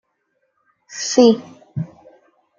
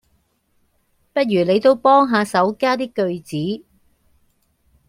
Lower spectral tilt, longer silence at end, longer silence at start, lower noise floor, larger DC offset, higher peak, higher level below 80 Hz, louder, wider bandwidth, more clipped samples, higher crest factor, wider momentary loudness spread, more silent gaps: second, -4.5 dB/octave vs -6 dB/octave; second, 0.75 s vs 1.3 s; second, 0.9 s vs 1.15 s; first, -69 dBFS vs -64 dBFS; neither; about the same, -2 dBFS vs -2 dBFS; about the same, -64 dBFS vs -62 dBFS; about the same, -17 LUFS vs -18 LUFS; second, 7.6 kHz vs 15 kHz; neither; about the same, 20 dB vs 18 dB; first, 19 LU vs 12 LU; neither